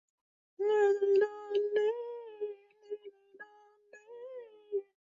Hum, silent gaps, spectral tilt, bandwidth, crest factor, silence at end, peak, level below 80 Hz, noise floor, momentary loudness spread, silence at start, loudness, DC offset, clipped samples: none; none; -4 dB/octave; 7.4 kHz; 16 dB; 0.25 s; -18 dBFS; -88 dBFS; -61 dBFS; 25 LU; 0.6 s; -32 LUFS; under 0.1%; under 0.1%